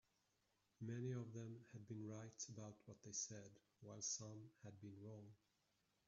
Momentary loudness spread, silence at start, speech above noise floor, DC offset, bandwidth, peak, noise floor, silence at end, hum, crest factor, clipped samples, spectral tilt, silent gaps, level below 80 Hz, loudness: 14 LU; 0.8 s; 32 dB; under 0.1%; 7.4 kHz; -36 dBFS; -86 dBFS; 0.7 s; none; 20 dB; under 0.1%; -6.5 dB/octave; none; -88 dBFS; -53 LUFS